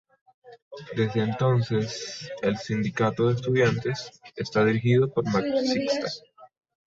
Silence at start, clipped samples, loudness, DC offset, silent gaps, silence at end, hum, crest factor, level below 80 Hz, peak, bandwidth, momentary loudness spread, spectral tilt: 0.45 s; under 0.1%; -25 LUFS; under 0.1%; 0.62-0.71 s; 0.4 s; none; 16 dB; -60 dBFS; -10 dBFS; 7.8 kHz; 13 LU; -6.5 dB/octave